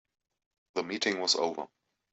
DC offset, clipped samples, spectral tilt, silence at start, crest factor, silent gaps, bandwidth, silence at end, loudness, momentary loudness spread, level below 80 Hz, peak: under 0.1%; under 0.1%; -1.5 dB/octave; 0.75 s; 22 dB; none; 8.2 kHz; 0.45 s; -30 LUFS; 14 LU; -78 dBFS; -14 dBFS